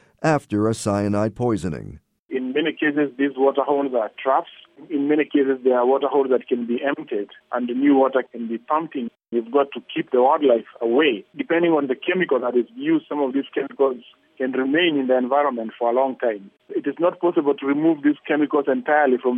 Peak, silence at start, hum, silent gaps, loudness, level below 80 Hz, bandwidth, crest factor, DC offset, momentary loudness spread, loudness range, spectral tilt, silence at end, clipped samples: -4 dBFS; 0.2 s; none; 2.19-2.29 s; -21 LUFS; -60 dBFS; 11.5 kHz; 16 dB; under 0.1%; 10 LU; 2 LU; -6 dB/octave; 0 s; under 0.1%